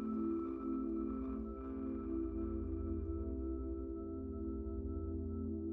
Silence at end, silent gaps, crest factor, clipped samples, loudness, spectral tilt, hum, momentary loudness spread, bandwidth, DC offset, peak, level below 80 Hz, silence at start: 0 s; none; 12 dB; under 0.1%; -42 LUFS; -12.5 dB/octave; none; 4 LU; 2.7 kHz; under 0.1%; -28 dBFS; -48 dBFS; 0 s